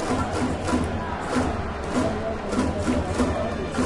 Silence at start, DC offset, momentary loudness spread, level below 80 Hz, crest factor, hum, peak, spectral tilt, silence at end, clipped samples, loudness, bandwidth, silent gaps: 0 s; under 0.1%; 3 LU; -38 dBFS; 14 dB; none; -10 dBFS; -6 dB/octave; 0 s; under 0.1%; -26 LUFS; 11.5 kHz; none